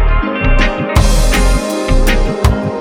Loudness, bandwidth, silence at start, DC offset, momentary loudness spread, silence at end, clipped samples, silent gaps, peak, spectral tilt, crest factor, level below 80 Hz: -14 LUFS; 16 kHz; 0 s; under 0.1%; 3 LU; 0 s; under 0.1%; none; 0 dBFS; -5 dB/octave; 10 dB; -12 dBFS